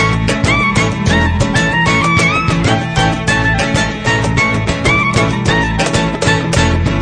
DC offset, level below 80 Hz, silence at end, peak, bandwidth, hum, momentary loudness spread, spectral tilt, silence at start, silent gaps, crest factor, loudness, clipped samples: under 0.1%; -26 dBFS; 0 s; 0 dBFS; 10.5 kHz; none; 3 LU; -5 dB/octave; 0 s; none; 12 dB; -12 LUFS; under 0.1%